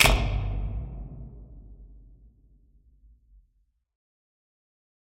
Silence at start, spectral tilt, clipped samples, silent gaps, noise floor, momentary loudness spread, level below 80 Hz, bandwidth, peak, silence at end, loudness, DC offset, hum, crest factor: 0 s; -3.5 dB/octave; under 0.1%; none; -70 dBFS; 25 LU; -34 dBFS; 12 kHz; -4 dBFS; 3.1 s; -29 LUFS; under 0.1%; none; 28 dB